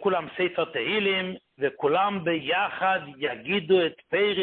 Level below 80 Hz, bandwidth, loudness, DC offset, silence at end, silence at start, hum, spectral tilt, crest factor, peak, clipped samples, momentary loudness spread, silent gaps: -66 dBFS; 4.4 kHz; -26 LUFS; under 0.1%; 0 s; 0 s; none; -9 dB/octave; 16 dB; -10 dBFS; under 0.1%; 7 LU; none